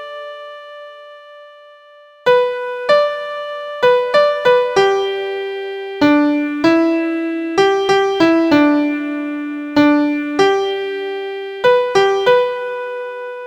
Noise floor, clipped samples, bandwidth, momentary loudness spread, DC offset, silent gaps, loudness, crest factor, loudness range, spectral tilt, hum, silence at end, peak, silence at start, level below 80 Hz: -44 dBFS; under 0.1%; 9.4 kHz; 13 LU; under 0.1%; none; -15 LUFS; 16 dB; 3 LU; -4.5 dB/octave; none; 0 s; 0 dBFS; 0 s; -58 dBFS